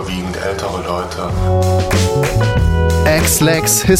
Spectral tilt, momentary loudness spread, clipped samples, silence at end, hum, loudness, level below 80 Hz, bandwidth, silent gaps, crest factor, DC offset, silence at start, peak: -4.5 dB/octave; 9 LU; under 0.1%; 0 s; none; -15 LUFS; -24 dBFS; 16.5 kHz; none; 12 dB; under 0.1%; 0 s; -2 dBFS